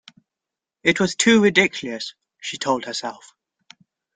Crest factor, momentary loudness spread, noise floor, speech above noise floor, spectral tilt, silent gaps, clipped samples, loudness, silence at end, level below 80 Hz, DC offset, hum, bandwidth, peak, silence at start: 20 dB; 18 LU; -87 dBFS; 67 dB; -3.5 dB/octave; none; under 0.1%; -19 LUFS; 1 s; -62 dBFS; under 0.1%; none; 9.6 kHz; -2 dBFS; 0.85 s